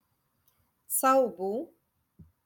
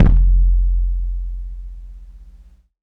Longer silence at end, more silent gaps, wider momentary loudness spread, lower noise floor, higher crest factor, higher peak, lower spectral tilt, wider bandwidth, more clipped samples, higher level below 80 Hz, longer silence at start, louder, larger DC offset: first, 0.8 s vs 0.6 s; neither; second, 14 LU vs 23 LU; first, -72 dBFS vs -46 dBFS; about the same, 18 dB vs 16 dB; second, -14 dBFS vs -2 dBFS; second, -3.5 dB/octave vs -11 dB/octave; first, 17.5 kHz vs 2 kHz; neither; second, -74 dBFS vs -16 dBFS; first, 0.9 s vs 0 s; second, -27 LUFS vs -20 LUFS; neither